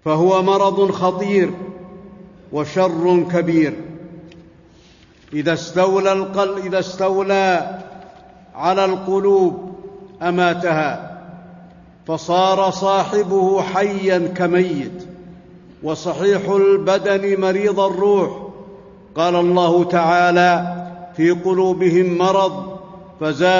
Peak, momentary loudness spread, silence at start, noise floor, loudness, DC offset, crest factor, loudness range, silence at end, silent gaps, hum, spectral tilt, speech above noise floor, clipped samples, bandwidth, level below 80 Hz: -4 dBFS; 17 LU; 0.05 s; -48 dBFS; -17 LUFS; under 0.1%; 14 dB; 4 LU; 0 s; none; none; -6 dB/octave; 32 dB; under 0.1%; 7.4 kHz; -56 dBFS